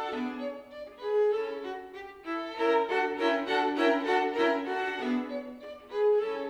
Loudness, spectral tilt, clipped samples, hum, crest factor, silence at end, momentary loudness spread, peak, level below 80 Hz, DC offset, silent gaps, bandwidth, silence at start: -29 LUFS; -4 dB/octave; under 0.1%; 60 Hz at -75 dBFS; 16 dB; 0 s; 15 LU; -14 dBFS; -70 dBFS; under 0.1%; none; 10 kHz; 0 s